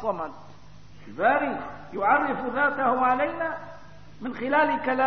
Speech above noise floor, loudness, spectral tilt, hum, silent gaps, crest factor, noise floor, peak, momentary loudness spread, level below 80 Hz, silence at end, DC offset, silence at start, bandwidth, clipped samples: 24 dB; -25 LUFS; -7 dB/octave; 50 Hz at -55 dBFS; none; 16 dB; -49 dBFS; -10 dBFS; 15 LU; -58 dBFS; 0 s; 0.6%; 0 s; 6.4 kHz; under 0.1%